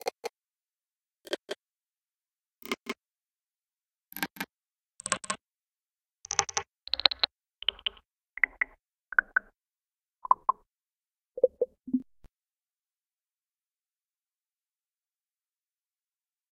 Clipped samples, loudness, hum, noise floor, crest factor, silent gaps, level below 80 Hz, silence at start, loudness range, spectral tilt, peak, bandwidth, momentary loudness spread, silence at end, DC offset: under 0.1%; -31 LUFS; none; under -90 dBFS; 36 dB; none; -68 dBFS; 0.05 s; 13 LU; -0.5 dB/octave; 0 dBFS; 15.5 kHz; 16 LU; 4.5 s; under 0.1%